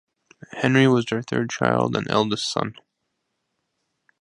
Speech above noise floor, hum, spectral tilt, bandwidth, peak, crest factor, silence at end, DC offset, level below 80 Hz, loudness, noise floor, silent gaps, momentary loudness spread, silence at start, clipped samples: 55 dB; none; -5.5 dB/octave; 11.5 kHz; -2 dBFS; 22 dB; 1.5 s; under 0.1%; -60 dBFS; -22 LUFS; -77 dBFS; none; 9 LU; 0.5 s; under 0.1%